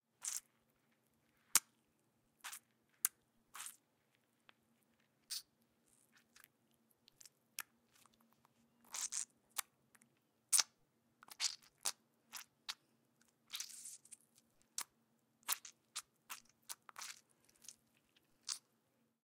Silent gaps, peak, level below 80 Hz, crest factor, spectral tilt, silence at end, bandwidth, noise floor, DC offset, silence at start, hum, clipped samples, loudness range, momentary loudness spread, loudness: none; -10 dBFS; under -90 dBFS; 38 dB; 3 dB/octave; 0.7 s; 16.5 kHz; -80 dBFS; under 0.1%; 0.2 s; none; under 0.1%; 14 LU; 23 LU; -43 LUFS